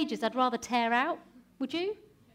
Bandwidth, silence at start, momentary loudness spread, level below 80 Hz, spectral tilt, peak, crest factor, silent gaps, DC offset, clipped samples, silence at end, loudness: 15.5 kHz; 0 s; 12 LU; -70 dBFS; -3.5 dB/octave; -14 dBFS; 18 dB; none; under 0.1%; under 0.1%; 0.4 s; -31 LUFS